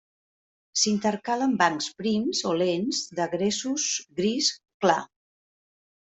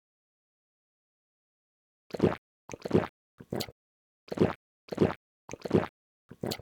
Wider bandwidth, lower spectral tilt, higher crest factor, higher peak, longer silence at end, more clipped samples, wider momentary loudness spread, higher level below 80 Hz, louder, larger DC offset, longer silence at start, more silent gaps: second, 8.2 kHz vs 19.5 kHz; second, -3 dB/octave vs -6.5 dB/octave; about the same, 22 dB vs 24 dB; first, -6 dBFS vs -10 dBFS; first, 1.1 s vs 0.05 s; neither; second, 5 LU vs 14 LU; second, -68 dBFS vs -58 dBFS; first, -26 LUFS vs -32 LUFS; neither; second, 0.75 s vs 2.15 s; second, 4.74-4.80 s vs 2.38-2.68 s, 3.09-3.38 s, 3.72-4.27 s, 4.55-4.88 s, 5.16-5.48 s, 5.89-6.29 s